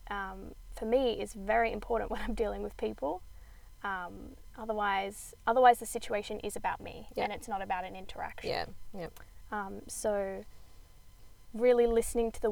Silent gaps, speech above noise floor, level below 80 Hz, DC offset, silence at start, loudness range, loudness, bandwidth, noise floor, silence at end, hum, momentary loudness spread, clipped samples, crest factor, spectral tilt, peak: none; 21 dB; -50 dBFS; under 0.1%; 0 s; 7 LU; -33 LUFS; over 20 kHz; -53 dBFS; 0 s; none; 18 LU; under 0.1%; 22 dB; -4 dB/octave; -10 dBFS